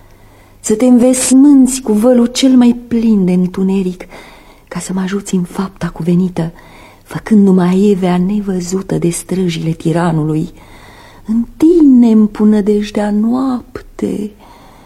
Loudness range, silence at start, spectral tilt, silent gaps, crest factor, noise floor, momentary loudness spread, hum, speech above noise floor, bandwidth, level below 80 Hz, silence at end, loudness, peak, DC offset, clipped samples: 7 LU; 0.65 s; -6 dB/octave; none; 12 dB; -41 dBFS; 15 LU; none; 30 dB; 14.5 kHz; -40 dBFS; 0.55 s; -12 LUFS; 0 dBFS; under 0.1%; under 0.1%